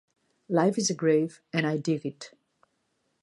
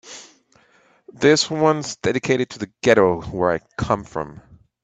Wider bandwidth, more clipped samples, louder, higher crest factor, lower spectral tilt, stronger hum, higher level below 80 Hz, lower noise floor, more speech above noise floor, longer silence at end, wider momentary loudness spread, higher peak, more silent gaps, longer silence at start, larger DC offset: first, 11.5 kHz vs 9 kHz; neither; second, -27 LUFS vs -20 LUFS; about the same, 20 dB vs 20 dB; about the same, -5 dB/octave vs -4.5 dB/octave; neither; second, -78 dBFS vs -50 dBFS; first, -75 dBFS vs -57 dBFS; first, 49 dB vs 38 dB; first, 0.95 s vs 0.45 s; about the same, 14 LU vs 14 LU; second, -10 dBFS vs 0 dBFS; neither; first, 0.5 s vs 0.05 s; neither